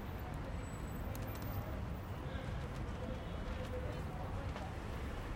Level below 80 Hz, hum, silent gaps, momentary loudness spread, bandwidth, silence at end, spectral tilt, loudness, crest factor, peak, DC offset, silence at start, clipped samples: -48 dBFS; none; none; 2 LU; 16.5 kHz; 0 s; -6.5 dB/octave; -44 LUFS; 12 dB; -30 dBFS; under 0.1%; 0 s; under 0.1%